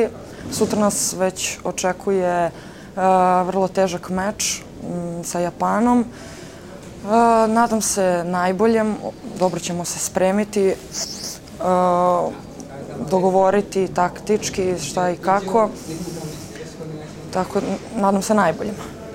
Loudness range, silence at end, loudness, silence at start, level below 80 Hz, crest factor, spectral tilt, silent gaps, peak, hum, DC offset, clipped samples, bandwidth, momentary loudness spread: 4 LU; 0 s; -20 LUFS; 0 s; -48 dBFS; 18 dB; -4.5 dB/octave; none; -4 dBFS; none; 0.1%; under 0.1%; 16 kHz; 16 LU